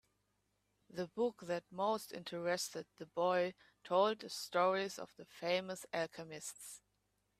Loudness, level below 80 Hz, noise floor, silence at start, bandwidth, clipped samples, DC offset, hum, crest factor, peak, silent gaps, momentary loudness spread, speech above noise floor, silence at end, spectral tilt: -39 LUFS; -82 dBFS; -82 dBFS; 0.95 s; 15.5 kHz; under 0.1%; under 0.1%; 50 Hz at -75 dBFS; 20 dB; -20 dBFS; none; 15 LU; 43 dB; 0.6 s; -3.5 dB/octave